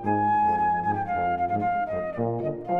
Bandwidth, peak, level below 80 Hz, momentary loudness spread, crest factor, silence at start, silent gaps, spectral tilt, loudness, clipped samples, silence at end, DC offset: 4.9 kHz; -10 dBFS; -56 dBFS; 6 LU; 14 dB; 0 s; none; -9.5 dB/octave; -25 LUFS; under 0.1%; 0 s; under 0.1%